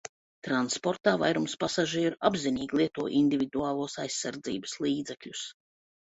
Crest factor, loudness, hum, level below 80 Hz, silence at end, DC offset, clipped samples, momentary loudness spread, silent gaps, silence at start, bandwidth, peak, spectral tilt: 22 dB; -29 LUFS; none; -66 dBFS; 0.5 s; under 0.1%; under 0.1%; 12 LU; 0.09-0.42 s; 0.05 s; 8.4 kHz; -8 dBFS; -4 dB/octave